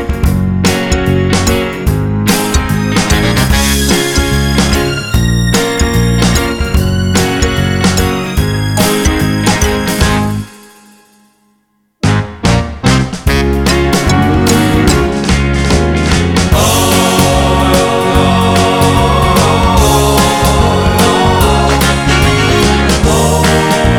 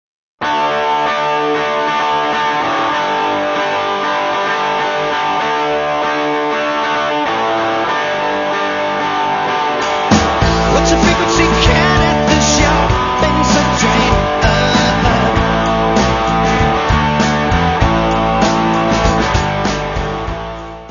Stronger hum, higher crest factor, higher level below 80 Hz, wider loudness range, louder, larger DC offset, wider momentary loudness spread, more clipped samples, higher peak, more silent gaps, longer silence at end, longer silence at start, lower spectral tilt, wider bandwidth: neither; about the same, 10 dB vs 14 dB; first, -18 dBFS vs -26 dBFS; about the same, 5 LU vs 4 LU; first, -10 LUFS vs -14 LUFS; neither; about the same, 4 LU vs 5 LU; neither; about the same, 0 dBFS vs 0 dBFS; neither; about the same, 0 s vs 0 s; second, 0 s vs 0.4 s; about the same, -4.5 dB/octave vs -4.5 dB/octave; first, 18.5 kHz vs 7.4 kHz